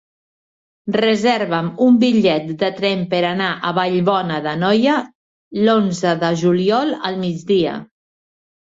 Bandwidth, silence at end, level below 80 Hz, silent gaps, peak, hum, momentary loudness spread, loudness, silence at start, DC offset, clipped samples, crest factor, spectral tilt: 7.8 kHz; 0.9 s; -60 dBFS; 5.15-5.51 s; -2 dBFS; none; 8 LU; -17 LUFS; 0.85 s; under 0.1%; under 0.1%; 14 dB; -6 dB/octave